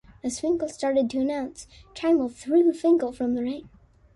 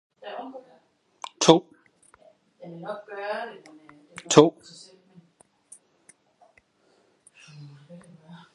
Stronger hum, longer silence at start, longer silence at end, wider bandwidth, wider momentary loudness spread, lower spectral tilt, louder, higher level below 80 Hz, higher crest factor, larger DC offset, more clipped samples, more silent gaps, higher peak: neither; about the same, 0.25 s vs 0.25 s; second, 0.5 s vs 0.9 s; about the same, 11.5 kHz vs 11.5 kHz; second, 14 LU vs 29 LU; about the same, -5 dB/octave vs -4.5 dB/octave; second, -25 LUFS vs -22 LUFS; first, -58 dBFS vs -72 dBFS; second, 14 dB vs 28 dB; neither; neither; neither; second, -10 dBFS vs 0 dBFS